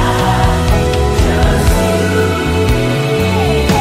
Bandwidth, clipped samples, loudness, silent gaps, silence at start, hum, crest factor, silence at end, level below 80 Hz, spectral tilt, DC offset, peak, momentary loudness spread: 16 kHz; under 0.1%; -13 LUFS; none; 0 s; none; 12 dB; 0 s; -18 dBFS; -5.5 dB/octave; under 0.1%; 0 dBFS; 2 LU